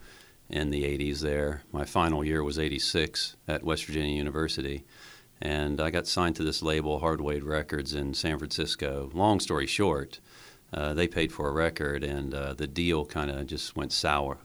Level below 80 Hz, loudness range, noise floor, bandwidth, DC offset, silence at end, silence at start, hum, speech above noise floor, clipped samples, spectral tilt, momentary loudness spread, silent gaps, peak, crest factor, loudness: -42 dBFS; 2 LU; -53 dBFS; over 20 kHz; under 0.1%; 0 s; 0 s; none; 23 dB; under 0.1%; -4.5 dB/octave; 7 LU; none; -8 dBFS; 22 dB; -30 LUFS